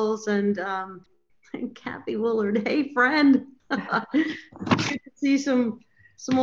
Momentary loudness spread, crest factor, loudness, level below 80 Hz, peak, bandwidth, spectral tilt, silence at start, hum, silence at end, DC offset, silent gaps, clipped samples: 15 LU; 18 dB; -24 LUFS; -68 dBFS; -6 dBFS; 7.6 kHz; -5.5 dB/octave; 0 s; none; 0 s; under 0.1%; none; under 0.1%